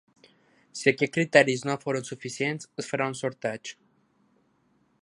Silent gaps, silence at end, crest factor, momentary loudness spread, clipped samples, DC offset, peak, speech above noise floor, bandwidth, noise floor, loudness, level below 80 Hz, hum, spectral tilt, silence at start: none; 1.3 s; 26 dB; 16 LU; under 0.1%; under 0.1%; -2 dBFS; 41 dB; 11.5 kHz; -68 dBFS; -26 LUFS; -76 dBFS; none; -4.5 dB/octave; 0.75 s